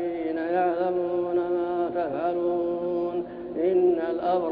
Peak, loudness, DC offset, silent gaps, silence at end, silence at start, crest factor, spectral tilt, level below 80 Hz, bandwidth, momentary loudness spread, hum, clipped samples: -12 dBFS; -26 LUFS; under 0.1%; none; 0 s; 0 s; 14 dB; -10 dB/octave; -62 dBFS; 4.8 kHz; 6 LU; none; under 0.1%